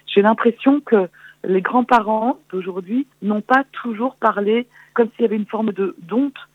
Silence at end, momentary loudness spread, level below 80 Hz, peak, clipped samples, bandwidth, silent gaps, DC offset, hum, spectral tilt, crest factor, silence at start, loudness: 0.1 s; 10 LU; -64 dBFS; -2 dBFS; under 0.1%; 7.8 kHz; none; under 0.1%; none; -7.5 dB/octave; 16 dB; 0.1 s; -19 LUFS